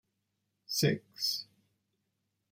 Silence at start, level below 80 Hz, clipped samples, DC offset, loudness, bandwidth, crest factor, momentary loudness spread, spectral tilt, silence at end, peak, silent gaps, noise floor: 0.7 s; -74 dBFS; under 0.1%; under 0.1%; -33 LUFS; 16.5 kHz; 22 dB; 6 LU; -4 dB/octave; 1.1 s; -16 dBFS; none; -82 dBFS